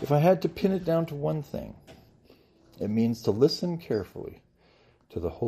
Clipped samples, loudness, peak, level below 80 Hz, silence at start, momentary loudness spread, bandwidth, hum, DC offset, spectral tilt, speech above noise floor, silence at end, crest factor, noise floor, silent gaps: under 0.1%; -27 LUFS; -10 dBFS; -56 dBFS; 0 s; 17 LU; 15 kHz; none; under 0.1%; -7.5 dB/octave; 35 dB; 0 s; 20 dB; -61 dBFS; none